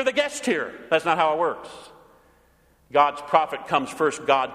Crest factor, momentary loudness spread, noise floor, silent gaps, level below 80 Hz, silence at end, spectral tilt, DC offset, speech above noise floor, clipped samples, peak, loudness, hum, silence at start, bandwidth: 22 dB; 6 LU; -60 dBFS; none; -64 dBFS; 0 s; -3.5 dB/octave; under 0.1%; 37 dB; under 0.1%; -2 dBFS; -23 LUFS; none; 0 s; 15.5 kHz